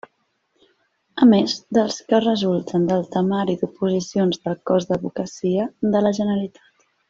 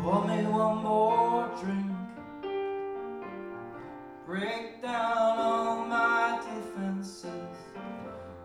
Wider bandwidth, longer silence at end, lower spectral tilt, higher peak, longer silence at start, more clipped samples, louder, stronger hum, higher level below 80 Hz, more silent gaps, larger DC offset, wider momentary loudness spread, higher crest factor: second, 7.6 kHz vs 12 kHz; first, 0.6 s vs 0 s; about the same, -6.5 dB/octave vs -6.5 dB/octave; first, -2 dBFS vs -14 dBFS; first, 1.15 s vs 0 s; neither; first, -20 LUFS vs -30 LUFS; neither; first, -60 dBFS vs -66 dBFS; neither; neither; second, 9 LU vs 16 LU; about the same, 18 dB vs 16 dB